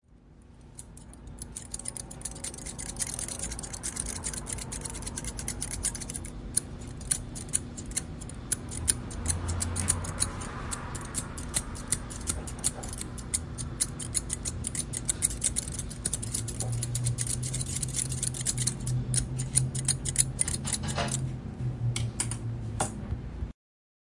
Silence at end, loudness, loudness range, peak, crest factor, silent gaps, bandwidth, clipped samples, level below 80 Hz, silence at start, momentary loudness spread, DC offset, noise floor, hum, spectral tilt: 0.55 s; -31 LUFS; 6 LU; -4 dBFS; 30 dB; none; 11.5 kHz; under 0.1%; -44 dBFS; 0.1 s; 10 LU; under 0.1%; -54 dBFS; none; -3 dB/octave